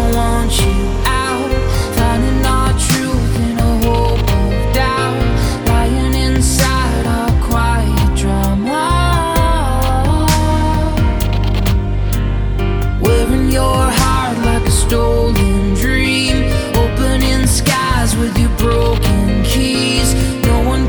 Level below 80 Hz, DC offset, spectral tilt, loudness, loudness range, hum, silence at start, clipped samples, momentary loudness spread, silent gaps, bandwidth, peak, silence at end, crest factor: -16 dBFS; under 0.1%; -5 dB/octave; -14 LUFS; 1 LU; none; 0 s; under 0.1%; 3 LU; none; over 20 kHz; 0 dBFS; 0 s; 12 dB